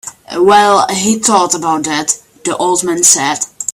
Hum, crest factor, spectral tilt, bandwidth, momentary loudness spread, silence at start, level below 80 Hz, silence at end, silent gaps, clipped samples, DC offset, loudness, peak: none; 12 dB; -2 dB/octave; over 20 kHz; 9 LU; 0.05 s; -54 dBFS; 0 s; none; 0.2%; under 0.1%; -11 LUFS; 0 dBFS